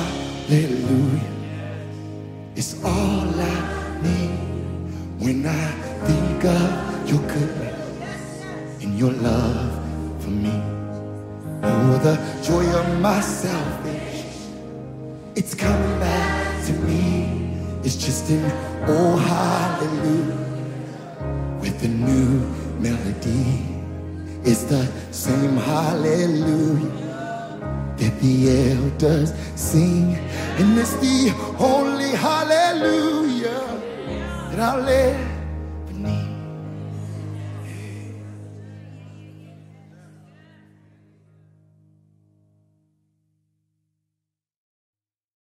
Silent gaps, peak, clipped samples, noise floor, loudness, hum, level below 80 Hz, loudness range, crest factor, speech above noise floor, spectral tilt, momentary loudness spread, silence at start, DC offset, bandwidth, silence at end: none; -4 dBFS; under 0.1%; -84 dBFS; -22 LUFS; none; -38 dBFS; 6 LU; 18 dB; 64 dB; -6 dB/octave; 14 LU; 0 s; under 0.1%; 16 kHz; 5.45 s